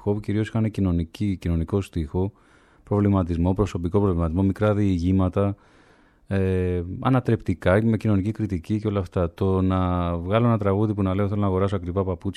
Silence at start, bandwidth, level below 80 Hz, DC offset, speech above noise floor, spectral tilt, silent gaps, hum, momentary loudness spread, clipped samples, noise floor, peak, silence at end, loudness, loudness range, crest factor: 0.05 s; 10.5 kHz; -40 dBFS; under 0.1%; 33 dB; -9 dB/octave; none; none; 6 LU; under 0.1%; -56 dBFS; -6 dBFS; 0.05 s; -23 LUFS; 2 LU; 16 dB